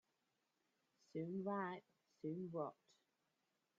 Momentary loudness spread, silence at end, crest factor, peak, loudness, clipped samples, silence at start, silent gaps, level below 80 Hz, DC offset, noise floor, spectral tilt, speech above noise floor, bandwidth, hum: 8 LU; 1.05 s; 20 dB; -32 dBFS; -48 LUFS; under 0.1%; 1.15 s; none; under -90 dBFS; under 0.1%; -87 dBFS; -7 dB/octave; 41 dB; 7.4 kHz; none